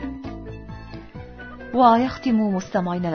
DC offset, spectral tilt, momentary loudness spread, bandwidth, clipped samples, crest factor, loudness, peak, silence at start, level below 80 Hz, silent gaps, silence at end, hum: under 0.1%; -7 dB/octave; 22 LU; 6.6 kHz; under 0.1%; 20 dB; -20 LUFS; -2 dBFS; 0 s; -44 dBFS; none; 0 s; none